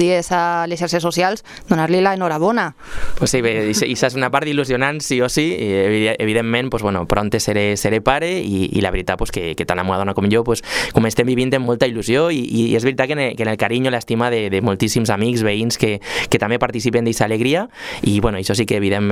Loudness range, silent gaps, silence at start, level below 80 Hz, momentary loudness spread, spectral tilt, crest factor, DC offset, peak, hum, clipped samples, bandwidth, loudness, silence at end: 1 LU; none; 0 s; -36 dBFS; 4 LU; -5 dB/octave; 18 dB; under 0.1%; 0 dBFS; none; under 0.1%; 16 kHz; -18 LUFS; 0 s